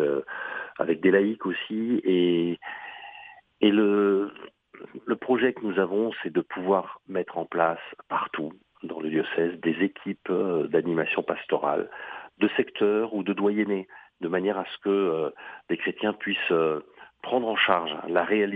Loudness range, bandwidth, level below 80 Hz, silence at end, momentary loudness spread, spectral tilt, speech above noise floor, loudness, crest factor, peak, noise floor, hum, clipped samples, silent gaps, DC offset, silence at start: 3 LU; 3.9 kHz; -72 dBFS; 0 s; 14 LU; -8.5 dB/octave; 22 dB; -26 LUFS; 22 dB; -4 dBFS; -48 dBFS; none; under 0.1%; none; under 0.1%; 0 s